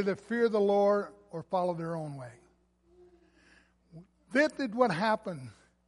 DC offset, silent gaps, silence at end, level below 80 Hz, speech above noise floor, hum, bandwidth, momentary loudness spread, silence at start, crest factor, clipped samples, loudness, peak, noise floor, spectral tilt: under 0.1%; none; 0.35 s; -72 dBFS; 37 dB; none; 11.5 kHz; 18 LU; 0 s; 20 dB; under 0.1%; -30 LUFS; -12 dBFS; -67 dBFS; -6.5 dB/octave